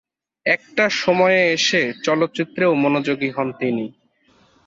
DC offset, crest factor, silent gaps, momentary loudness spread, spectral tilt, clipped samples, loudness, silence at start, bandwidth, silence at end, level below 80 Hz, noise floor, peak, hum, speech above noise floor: under 0.1%; 16 dB; none; 8 LU; -4 dB/octave; under 0.1%; -19 LUFS; 0.45 s; 7.8 kHz; 0.75 s; -64 dBFS; -58 dBFS; -4 dBFS; none; 39 dB